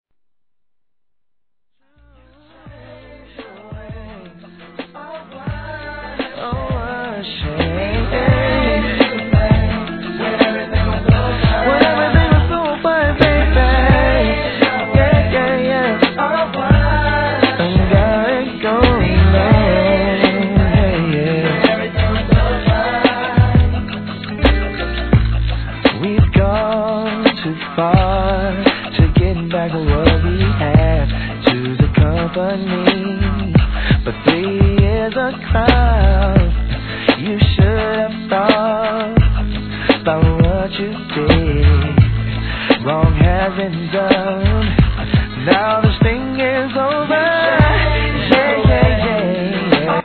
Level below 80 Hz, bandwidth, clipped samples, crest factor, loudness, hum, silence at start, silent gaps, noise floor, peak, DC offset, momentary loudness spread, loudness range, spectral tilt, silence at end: -22 dBFS; 4.6 kHz; under 0.1%; 14 dB; -15 LUFS; none; 2.65 s; none; -81 dBFS; 0 dBFS; 0.1%; 9 LU; 3 LU; -10 dB/octave; 0 s